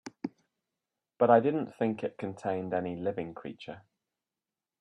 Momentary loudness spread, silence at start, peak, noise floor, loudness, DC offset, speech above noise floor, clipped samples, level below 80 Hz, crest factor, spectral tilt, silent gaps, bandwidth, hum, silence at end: 19 LU; 0.05 s; -10 dBFS; under -90 dBFS; -30 LUFS; under 0.1%; over 60 dB; under 0.1%; -74 dBFS; 22 dB; -7.5 dB/octave; none; 10 kHz; none; 1 s